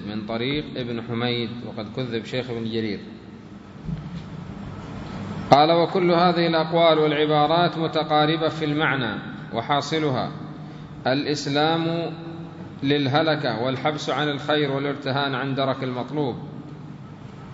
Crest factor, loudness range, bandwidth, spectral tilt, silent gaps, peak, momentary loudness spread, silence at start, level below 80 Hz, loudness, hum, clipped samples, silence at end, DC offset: 24 dB; 10 LU; 7.8 kHz; -6 dB/octave; none; 0 dBFS; 18 LU; 0 s; -54 dBFS; -23 LUFS; none; under 0.1%; 0 s; under 0.1%